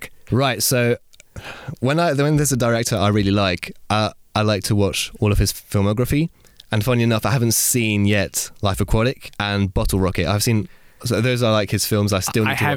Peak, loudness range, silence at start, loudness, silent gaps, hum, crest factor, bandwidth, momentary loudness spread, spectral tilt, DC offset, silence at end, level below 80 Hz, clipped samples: -6 dBFS; 1 LU; 0 s; -19 LUFS; none; none; 12 dB; 17.5 kHz; 6 LU; -4.5 dB/octave; under 0.1%; 0 s; -34 dBFS; under 0.1%